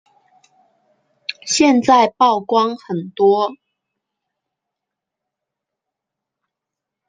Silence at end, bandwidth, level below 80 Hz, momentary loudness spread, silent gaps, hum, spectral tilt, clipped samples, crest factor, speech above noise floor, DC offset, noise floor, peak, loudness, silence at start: 3.55 s; 9.4 kHz; -66 dBFS; 15 LU; none; none; -3.5 dB/octave; under 0.1%; 18 dB; 68 dB; under 0.1%; -83 dBFS; -2 dBFS; -15 LUFS; 1.3 s